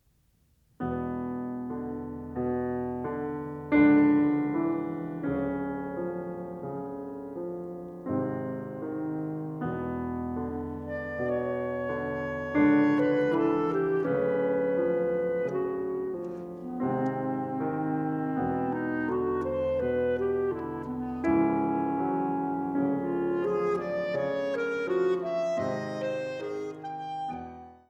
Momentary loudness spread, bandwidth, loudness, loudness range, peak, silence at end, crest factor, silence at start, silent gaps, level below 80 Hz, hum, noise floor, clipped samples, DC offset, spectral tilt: 11 LU; 7 kHz; -30 LUFS; 8 LU; -12 dBFS; 0.15 s; 18 dB; 0.8 s; none; -56 dBFS; none; -67 dBFS; under 0.1%; under 0.1%; -8.5 dB/octave